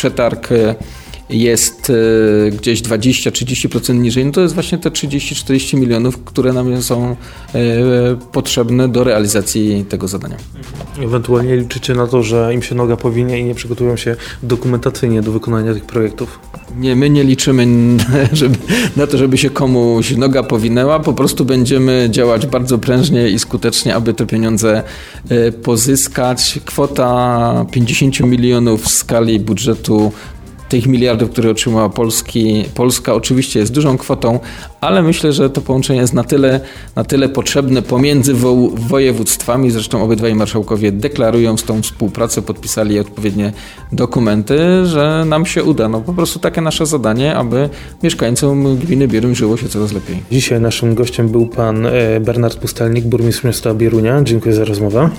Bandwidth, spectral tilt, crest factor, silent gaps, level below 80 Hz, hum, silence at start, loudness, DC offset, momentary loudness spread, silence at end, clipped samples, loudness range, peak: 17 kHz; -5.5 dB/octave; 12 dB; none; -34 dBFS; none; 0 s; -13 LUFS; under 0.1%; 7 LU; 0 s; under 0.1%; 3 LU; 0 dBFS